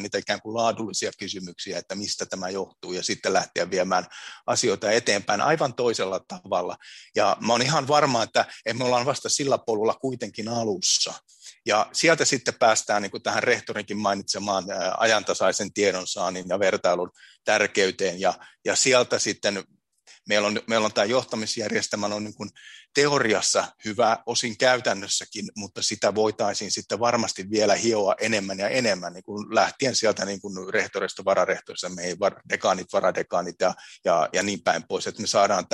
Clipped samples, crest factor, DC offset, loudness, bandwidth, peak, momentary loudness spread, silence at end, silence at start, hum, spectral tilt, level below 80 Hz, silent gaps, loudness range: under 0.1%; 20 dB; under 0.1%; -24 LUFS; 12.5 kHz; -4 dBFS; 10 LU; 0.1 s; 0 s; none; -2.5 dB/octave; -70 dBFS; none; 3 LU